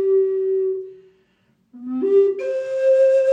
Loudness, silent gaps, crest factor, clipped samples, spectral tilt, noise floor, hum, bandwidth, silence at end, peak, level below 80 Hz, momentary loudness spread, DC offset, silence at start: -19 LUFS; none; 12 dB; under 0.1%; -5.5 dB/octave; -63 dBFS; none; 7.4 kHz; 0 s; -8 dBFS; -78 dBFS; 15 LU; under 0.1%; 0 s